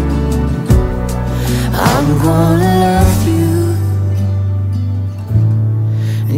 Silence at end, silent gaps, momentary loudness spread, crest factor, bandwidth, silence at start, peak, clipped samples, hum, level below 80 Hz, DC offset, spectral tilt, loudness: 0 s; none; 6 LU; 12 dB; 16.5 kHz; 0 s; 0 dBFS; under 0.1%; none; -22 dBFS; under 0.1%; -7 dB/octave; -14 LUFS